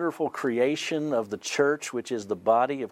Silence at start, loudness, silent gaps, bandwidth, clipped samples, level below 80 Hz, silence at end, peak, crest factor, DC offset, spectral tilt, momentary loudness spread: 0 s; -27 LUFS; none; 15 kHz; under 0.1%; -74 dBFS; 0.05 s; -10 dBFS; 18 dB; under 0.1%; -4 dB/octave; 7 LU